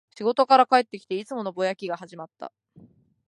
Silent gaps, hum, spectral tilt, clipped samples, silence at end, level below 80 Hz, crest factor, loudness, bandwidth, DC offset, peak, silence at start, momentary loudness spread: none; none; -5 dB/octave; under 0.1%; 0.85 s; -78 dBFS; 22 dB; -23 LUFS; 11.5 kHz; under 0.1%; -4 dBFS; 0.2 s; 23 LU